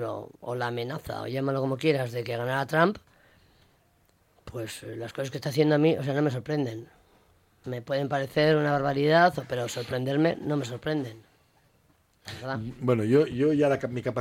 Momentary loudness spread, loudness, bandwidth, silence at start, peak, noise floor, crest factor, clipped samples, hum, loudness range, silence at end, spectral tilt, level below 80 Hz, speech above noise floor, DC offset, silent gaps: 15 LU; -27 LUFS; 16.5 kHz; 0 s; -8 dBFS; -65 dBFS; 20 dB; under 0.1%; none; 6 LU; 0 s; -6.5 dB/octave; -62 dBFS; 39 dB; under 0.1%; none